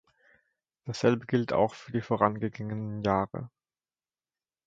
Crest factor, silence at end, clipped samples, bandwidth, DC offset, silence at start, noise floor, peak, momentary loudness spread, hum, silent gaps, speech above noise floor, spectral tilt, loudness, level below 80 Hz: 24 dB; 1.2 s; under 0.1%; 7.8 kHz; under 0.1%; 0.85 s; under -90 dBFS; -6 dBFS; 13 LU; none; none; over 61 dB; -7 dB/octave; -29 LUFS; -60 dBFS